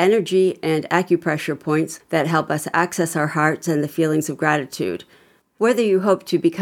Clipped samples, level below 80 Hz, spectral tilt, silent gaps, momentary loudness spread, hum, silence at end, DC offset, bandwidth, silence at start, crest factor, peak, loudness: under 0.1%; -70 dBFS; -5.5 dB/octave; none; 5 LU; none; 0 s; under 0.1%; 17 kHz; 0 s; 18 dB; -2 dBFS; -20 LUFS